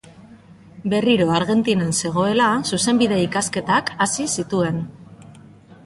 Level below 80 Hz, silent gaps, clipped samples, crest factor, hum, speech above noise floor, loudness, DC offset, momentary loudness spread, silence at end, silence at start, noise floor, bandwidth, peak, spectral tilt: -54 dBFS; none; under 0.1%; 16 dB; none; 26 dB; -19 LUFS; under 0.1%; 6 LU; 0.1 s; 0.2 s; -45 dBFS; 11.5 kHz; -4 dBFS; -4.5 dB/octave